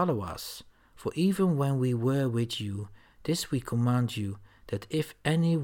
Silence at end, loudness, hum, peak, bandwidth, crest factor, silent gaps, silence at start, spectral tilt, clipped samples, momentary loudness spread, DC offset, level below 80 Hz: 0 s; -30 LUFS; none; -12 dBFS; 17.5 kHz; 16 dB; none; 0 s; -6.5 dB/octave; under 0.1%; 13 LU; under 0.1%; -58 dBFS